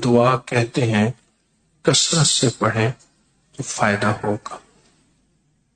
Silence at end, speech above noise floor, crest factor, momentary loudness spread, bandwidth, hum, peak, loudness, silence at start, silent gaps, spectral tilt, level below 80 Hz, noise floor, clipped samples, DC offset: 1.15 s; 45 dB; 18 dB; 18 LU; 9.4 kHz; none; -4 dBFS; -19 LUFS; 0 s; none; -4 dB/octave; -54 dBFS; -64 dBFS; under 0.1%; under 0.1%